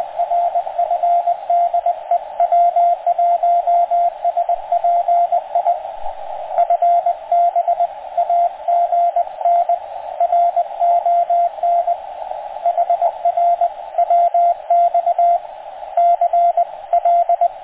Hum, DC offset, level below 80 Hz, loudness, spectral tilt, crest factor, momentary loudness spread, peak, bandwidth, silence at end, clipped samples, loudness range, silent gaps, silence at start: none; under 0.1%; -58 dBFS; -17 LUFS; -5.5 dB/octave; 10 dB; 7 LU; -6 dBFS; 3.9 kHz; 0 s; under 0.1%; 2 LU; none; 0 s